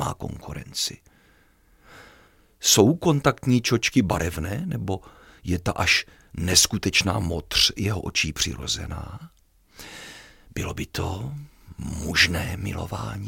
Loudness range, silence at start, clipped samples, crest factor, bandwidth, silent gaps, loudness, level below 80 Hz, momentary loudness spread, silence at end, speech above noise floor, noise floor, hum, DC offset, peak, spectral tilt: 8 LU; 0 s; under 0.1%; 24 dB; 17 kHz; none; -23 LUFS; -42 dBFS; 20 LU; 0 s; 34 dB; -58 dBFS; none; under 0.1%; -2 dBFS; -3.5 dB/octave